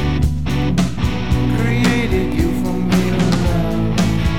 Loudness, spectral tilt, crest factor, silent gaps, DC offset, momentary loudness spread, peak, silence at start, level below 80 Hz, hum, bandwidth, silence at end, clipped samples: -17 LUFS; -6.5 dB/octave; 10 dB; none; 5%; 3 LU; -6 dBFS; 0 s; -24 dBFS; none; 17 kHz; 0 s; under 0.1%